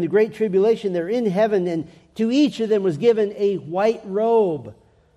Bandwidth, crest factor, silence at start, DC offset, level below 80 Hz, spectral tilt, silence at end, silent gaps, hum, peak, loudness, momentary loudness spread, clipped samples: 11 kHz; 14 dB; 0 s; under 0.1%; -64 dBFS; -7 dB/octave; 0.45 s; none; none; -6 dBFS; -20 LUFS; 6 LU; under 0.1%